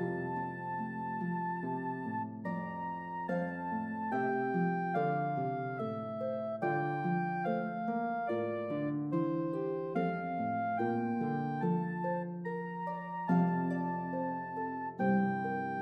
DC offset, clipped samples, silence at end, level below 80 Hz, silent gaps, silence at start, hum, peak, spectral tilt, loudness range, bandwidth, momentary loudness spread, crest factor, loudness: under 0.1%; under 0.1%; 0 s; -80 dBFS; none; 0 s; none; -20 dBFS; -10 dB/octave; 3 LU; 5 kHz; 6 LU; 16 dB; -35 LUFS